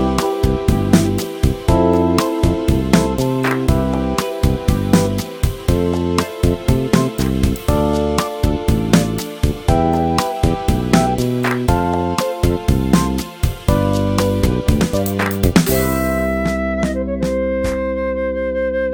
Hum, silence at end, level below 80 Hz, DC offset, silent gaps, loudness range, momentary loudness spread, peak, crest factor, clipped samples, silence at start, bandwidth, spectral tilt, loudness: none; 0 s; -24 dBFS; under 0.1%; none; 2 LU; 5 LU; 0 dBFS; 16 dB; under 0.1%; 0 s; 19.5 kHz; -6 dB/octave; -17 LUFS